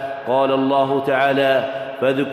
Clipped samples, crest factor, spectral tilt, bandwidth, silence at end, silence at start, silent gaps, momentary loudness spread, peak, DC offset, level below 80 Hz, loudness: under 0.1%; 14 dB; -6.5 dB/octave; 14 kHz; 0 s; 0 s; none; 5 LU; -4 dBFS; under 0.1%; -64 dBFS; -18 LUFS